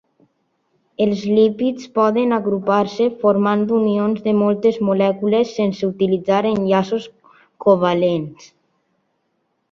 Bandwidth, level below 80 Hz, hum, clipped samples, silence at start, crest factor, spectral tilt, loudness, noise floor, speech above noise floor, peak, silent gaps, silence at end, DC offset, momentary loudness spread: 7 kHz; -60 dBFS; none; under 0.1%; 1 s; 16 dB; -7.5 dB/octave; -18 LUFS; -69 dBFS; 52 dB; -2 dBFS; none; 1.25 s; under 0.1%; 5 LU